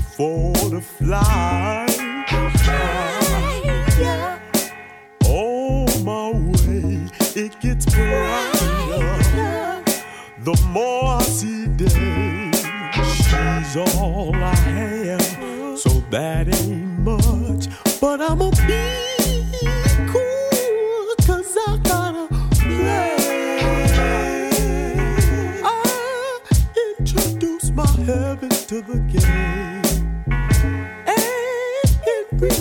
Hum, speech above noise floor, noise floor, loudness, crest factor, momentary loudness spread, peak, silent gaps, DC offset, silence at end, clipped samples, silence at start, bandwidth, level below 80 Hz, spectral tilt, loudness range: none; 22 dB; -39 dBFS; -19 LUFS; 16 dB; 5 LU; -2 dBFS; none; under 0.1%; 0 s; under 0.1%; 0 s; 19.5 kHz; -22 dBFS; -5 dB/octave; 1 LU